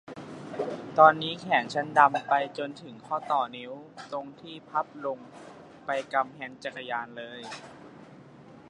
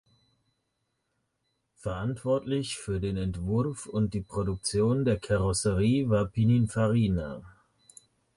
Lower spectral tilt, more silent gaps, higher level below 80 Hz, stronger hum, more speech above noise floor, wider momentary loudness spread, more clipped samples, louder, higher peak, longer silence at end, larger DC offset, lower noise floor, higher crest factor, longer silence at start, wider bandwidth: second, -5 dB/octave vs -6.5 dB/octave; neither; second, -74 dBFS vs -46 dBFS; neither; second, 22 dB vs 52 dB; first, 22 LU vs 8 LU; neither; about the same, -27 LUFS vs -28 LUFS; first, -4 dBFS vs -14 dBFS; second, 0.1 s vs 0.85 s; neither; second, -50 dBFS vs -79 dBFS; first, 26 dB vs 14 dB; second, 0.1 s vs 1.85 s; about the same, 10.5 kHz vs 11.5 kHz